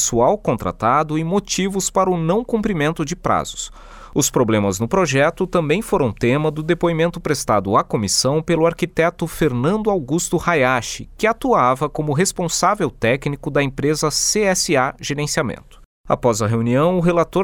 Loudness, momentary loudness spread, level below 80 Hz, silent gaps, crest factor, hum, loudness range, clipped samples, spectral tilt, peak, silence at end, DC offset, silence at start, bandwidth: -18 LUFS; 5 LU; -42 dBFS; 15.85-16.04 s; 16 dB; none; 1 LU; under 0.1%; -4.5 dB/octave; -2 dBFS; 0 s; under 0.1%; 0 s; 19.5 kHz